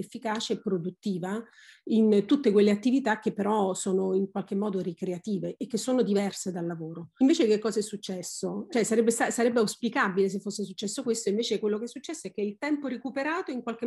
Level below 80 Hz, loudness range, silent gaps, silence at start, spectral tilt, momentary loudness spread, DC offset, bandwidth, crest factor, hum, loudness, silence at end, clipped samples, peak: -74 dBFS; 4 LU; none; 0 s; -5 dB/octave; 11 LU; under 0.1%; 12.5 kHz; 16 dB; none; -28 LUFS; 0 s; under 0.1%; -12 dBFS